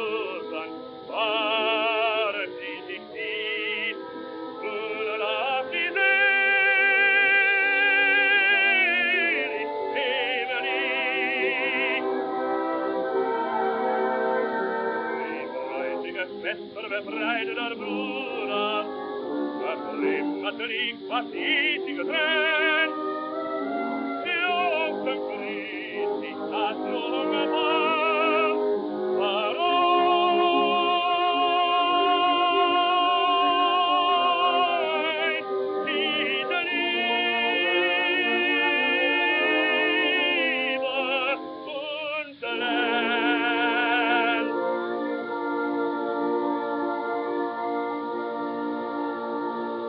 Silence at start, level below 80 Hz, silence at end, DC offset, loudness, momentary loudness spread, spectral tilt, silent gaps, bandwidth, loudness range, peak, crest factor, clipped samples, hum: 0 s; -76 dBFS; 0 s; under 0.1%; -24 LUFS; 11 LU; 1 dB/octave; none; 5.4 kHz; 8 LU; -10 dBFS; 14 dB; under 0.1%; none